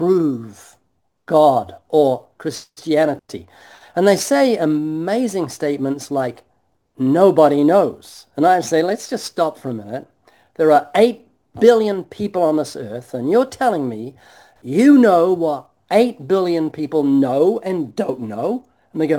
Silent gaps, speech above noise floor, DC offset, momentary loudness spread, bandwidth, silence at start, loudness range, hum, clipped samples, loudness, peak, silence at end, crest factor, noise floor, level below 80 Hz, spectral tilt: none; 51 dB; under 0.1%; 15 LU; 18 kHz; 0 s; 3 LU; none; under 0.1%; -17 LUFS; 0 dBFS; 0 s; 18 dB; -68 dBFS; -64 dBFS; -6 dB/octave